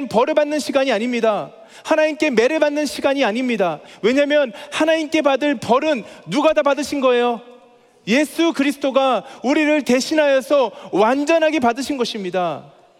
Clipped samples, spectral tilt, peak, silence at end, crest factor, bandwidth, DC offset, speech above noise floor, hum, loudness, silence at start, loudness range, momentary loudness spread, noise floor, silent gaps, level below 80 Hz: under 0.1%; -4 dB/octave; 0 dBFS; 0.35 s; 18 dB; 15.5 kHz; under 0.1%; 32 dB; none; -18 LUFS; 0 s; 2 LU; 6 LU; -50 dBFS; none; -62 dBFS